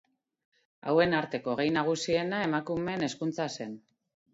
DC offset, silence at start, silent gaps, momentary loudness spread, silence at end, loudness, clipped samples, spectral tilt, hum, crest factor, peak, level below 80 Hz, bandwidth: under 0.1%; 0.85 s; none; 13 LU; 0.55 s; -30 LUFS; under 0.1%; -5 dB/octave; none; 20 dB; -12 dBFS; -64 dBFS; 8 kHz